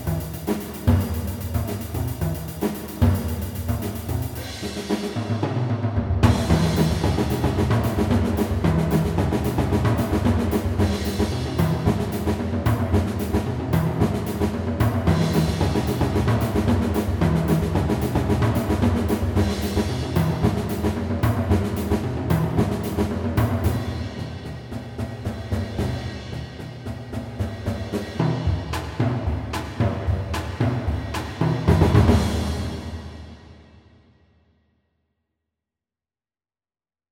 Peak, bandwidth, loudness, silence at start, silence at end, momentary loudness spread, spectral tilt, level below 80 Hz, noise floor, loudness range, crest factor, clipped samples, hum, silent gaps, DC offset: -2 dBFS; over 20 kHz; -23 LUFS; 0 s; 3.5 s; 10 LU; -7 dB/octave; -32 dBFS; under -90 dBFS; 6 LU; 20 dB; under 0.1%; none; none; under 0.1%